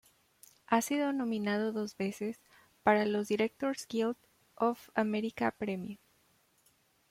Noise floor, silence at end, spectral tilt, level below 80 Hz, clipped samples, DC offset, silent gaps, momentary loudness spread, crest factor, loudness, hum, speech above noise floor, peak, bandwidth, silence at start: -70 dBFS; 1.15 s; -5 dB/octave; -74 dBFS; under 0.1%; under 0.1%; none; 11 LU; 22 dB; -33 LUFS; none; 38 dB; -12 dBFS; 16 kHz; 0.7 s